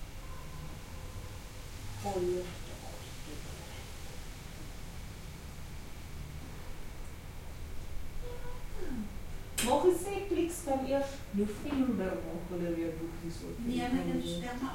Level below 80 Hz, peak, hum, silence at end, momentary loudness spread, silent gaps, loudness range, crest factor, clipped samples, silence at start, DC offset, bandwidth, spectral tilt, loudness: -46 dBFS; -14 dBFS; none; 0 s; 15 LU; none; 14 LU; 22 dB; under 0.1%; 0 s; under 0.1%; 16.5 kHz; -5 dB/octave; -37 LUFS